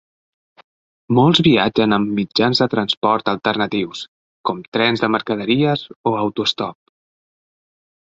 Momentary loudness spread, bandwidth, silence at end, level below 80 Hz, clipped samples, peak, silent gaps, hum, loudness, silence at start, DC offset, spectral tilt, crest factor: 12 LU; 8 kHz; 1.4 s; -54 dBFS; under 0.1%; -2 dBFS; 2.97-3.02 s, 4.08-4.44 s, 4.68-4.72 s, 5.96-6.04 s; none; -18 LUFS; 1.1 s; under 0.1%; -6 dB/octave; 18 dB